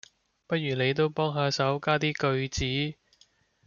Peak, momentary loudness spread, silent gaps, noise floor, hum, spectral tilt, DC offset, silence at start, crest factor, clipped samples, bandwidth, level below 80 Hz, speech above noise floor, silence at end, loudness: -10 dBFS; 5 LU; none; -64 dBFS; none; -5 dB/octave; under 0.1%; 0.5 s; 18 dB; under 0.1%; 7.2 kHz; -52 dBFS; 37 dB; 0.75 s; -28 LUFS